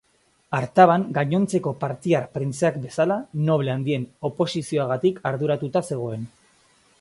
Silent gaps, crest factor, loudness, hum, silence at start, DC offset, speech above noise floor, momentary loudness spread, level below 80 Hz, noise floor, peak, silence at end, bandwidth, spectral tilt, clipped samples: none; 22 dB; -23 LUFS; none; 0.5 s; under 0.1%; 37 dB; 12 LU; -62 dBFS; -59 dBFS; -2 dBFS; 0.75 s; 11.5 kHz; -6.5 dB/octave; under 0.1%